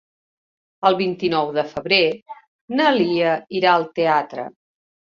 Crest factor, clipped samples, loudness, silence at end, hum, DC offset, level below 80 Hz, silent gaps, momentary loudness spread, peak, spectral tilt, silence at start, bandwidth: 18 dB; under 0.1%; -19 LUFS; 0.65 s; none; under 0.1%; -62 dBFS; 2.22-2.26 s, 2.48-2.68 s; 10 LU; -2 dBFS; -6 dB/octave; 0.8 s; 7.2 kHz